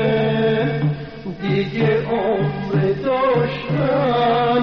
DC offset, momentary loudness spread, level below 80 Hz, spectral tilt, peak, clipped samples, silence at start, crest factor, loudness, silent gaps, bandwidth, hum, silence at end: under 0.1%; 5 LU; -46 dBFS; -5.5 dB/octave; -8 dBFS; under 0.1%; 0 s; 12 dB; -19 LUFS; none; 6 kHz; none; 0 s